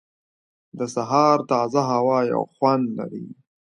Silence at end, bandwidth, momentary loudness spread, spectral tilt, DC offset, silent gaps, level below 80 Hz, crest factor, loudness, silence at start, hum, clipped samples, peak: 0.35 s; 11 kHz; 14 LU; -6.5 dB/octave; under 0.1%; none; -70 dBFS; 18 dB; -21 LUFS; 0.75 s; none; under 0.1%; -4 dBFS